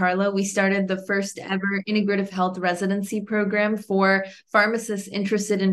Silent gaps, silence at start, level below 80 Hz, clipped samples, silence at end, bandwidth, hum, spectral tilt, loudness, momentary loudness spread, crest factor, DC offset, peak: none; 0 s; -70 dBFS; under 0.1%; 0 s; 12.5 kHz; none; -5 dB/octave; -23 LUFS; 6 LU; 18 dB; under 0.1%; -4 dBFS